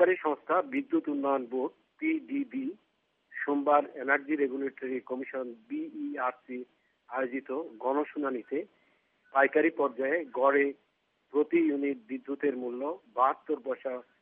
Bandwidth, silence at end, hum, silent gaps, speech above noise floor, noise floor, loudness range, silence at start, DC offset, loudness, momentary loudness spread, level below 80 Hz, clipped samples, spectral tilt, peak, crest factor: 3.8 kHz; 0.2 s; none; none; 39 dB; -69 dBFS; 6 LU; 0 s; under 0.1%; -31 LUFS; 12 LU; under -90 dBFS; under 0.1%; -3.5 dB/octave; -10 dBFS; 20 dB